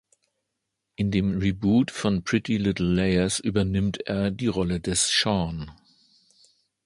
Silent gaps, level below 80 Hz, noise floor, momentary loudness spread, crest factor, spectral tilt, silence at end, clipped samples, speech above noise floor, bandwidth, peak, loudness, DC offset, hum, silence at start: none; -44 dBFS; -81 dBFS; 6 LU; 18 dB; -4.5 dB/octave; 1.15 s; under 0.1%; 57 dB; 11.5 kHz; -8 dBFS; -24 LUFS; under 0.1%; none; 1 s